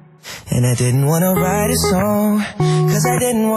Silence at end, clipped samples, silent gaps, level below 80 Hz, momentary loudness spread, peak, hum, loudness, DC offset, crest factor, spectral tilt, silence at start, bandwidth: 0 s; under 0.1%; none; -40 dBFS; 3 LU; -6 dBFS; none; -16 LUFS; under 0.1%; 10 dB; -5.5 dB/octave; 0.25 s; 15.5 kHz